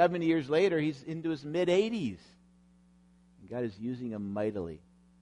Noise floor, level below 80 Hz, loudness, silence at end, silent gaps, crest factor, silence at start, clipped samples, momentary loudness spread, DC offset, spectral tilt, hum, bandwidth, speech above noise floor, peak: -62 dBFS; -66 dBFS; -32 LUFS; 0.45 s; none; 18 dB; 0 s; under 0.1%; 14 LU; under 0.1%; -6.5 dB/octave; none; 10.5 kHz; 32 dB; -14 dBFS